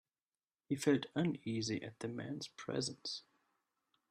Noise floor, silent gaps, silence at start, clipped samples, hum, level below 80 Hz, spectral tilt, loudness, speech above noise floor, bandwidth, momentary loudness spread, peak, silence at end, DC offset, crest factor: under -90 dBFS; none; 0.7 s; under 0.1%; none; -78 dBFS; -5 dB/octave; -40 LUFS; over 51 dB; 13.5 kHz; 11 LU; -18 dBFS; 0.9 s; under 0.1%; 22 dB